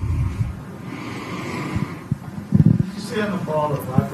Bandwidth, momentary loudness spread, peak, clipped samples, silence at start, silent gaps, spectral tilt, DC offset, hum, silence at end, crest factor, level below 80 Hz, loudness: 14 kHz; 13 LU; -2 dBFS; under 0.1%; 0 s; none; -7.5 dB/octave; under 0.1%; none; 0 s; 20 dB; -36 dBFS; -23 LUFS